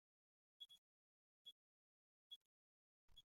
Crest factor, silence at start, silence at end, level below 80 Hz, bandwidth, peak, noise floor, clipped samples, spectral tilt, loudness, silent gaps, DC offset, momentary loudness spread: 22 dB; 0.6 s; 0 s; under -90 dBFS; 16 kHz; -50 dBFS; under -90 dBFS; under 0.1%; 0 dB/octave; -64 LUFS; 0.78-1.45 s, 1.52-3.08 s; under 0.1%; 2 LU